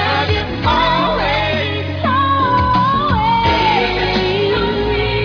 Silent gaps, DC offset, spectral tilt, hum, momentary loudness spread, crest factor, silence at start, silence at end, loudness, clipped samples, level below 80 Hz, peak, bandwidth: none; under 0.1%; -6.5 dB/octave; none; 4 LU; 12 dB; 0 s; 0 s; -15 LUFS; under 0.1%; -28 dBFS; -2 dBFS; 5.4 kHz